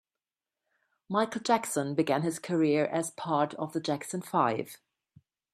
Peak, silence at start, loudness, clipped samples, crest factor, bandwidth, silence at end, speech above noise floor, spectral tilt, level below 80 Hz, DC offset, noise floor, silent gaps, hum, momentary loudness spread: -12 dBFS; 1.1 s; -30 LUFS; under 0.1%; 20 dB; 14.5 kHz; 0.8 s; over 61 dB; -5 dB/octave; -76 dBFS; under 0.1%; under -90 dBFS; none; none; 6 LU